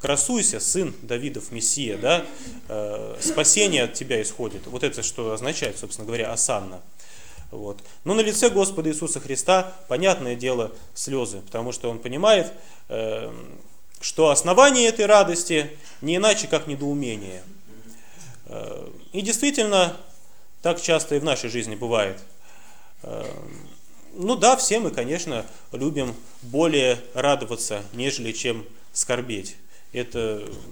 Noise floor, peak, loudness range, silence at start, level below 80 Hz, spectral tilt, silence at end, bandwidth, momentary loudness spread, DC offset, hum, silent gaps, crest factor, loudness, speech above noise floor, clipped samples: -55 dBFS; 0 dBFS; 7 LU; 0 s; -56 dBFS; -2.5 dB/octave; 0 s; over 20 kHz; 18 LU; 1%; none; none; 24 dB; -22 LUFS; 32 dB; under 0.1%